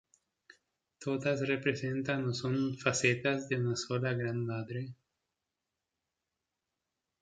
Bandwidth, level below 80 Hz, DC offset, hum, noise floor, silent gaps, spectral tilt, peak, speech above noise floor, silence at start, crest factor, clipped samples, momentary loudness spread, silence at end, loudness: 9.4 kHz; -72 dBFS; under 0.1%; none; -88 dBFS; none; -5 dB/octave; -14 dBFS; 55 dB; 1 s; 22 dB; under 0.1%; 9 LU; 2.3 s; -33 LUFS